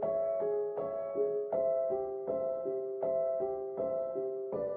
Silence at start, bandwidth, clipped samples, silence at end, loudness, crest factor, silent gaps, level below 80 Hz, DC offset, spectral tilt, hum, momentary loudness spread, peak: 0 s; 2.8 kHz; under 0.1%; 0 s; -34 LUFS; 12 dB; none; -72 dBFS; under 0.1%; -9 dB/octave; none; 5 LU; -22 dBFS